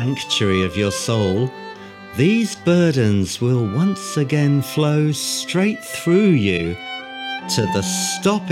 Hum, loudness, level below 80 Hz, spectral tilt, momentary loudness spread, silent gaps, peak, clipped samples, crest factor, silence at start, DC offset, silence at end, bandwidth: none; -19 LUFS; -52 dBFS; -5 dB/octave; 11 LU; none; -4 dBFS; under 0.1%; 14 dB; 0 s; under 0.1%; 0 s; 16.5 kHz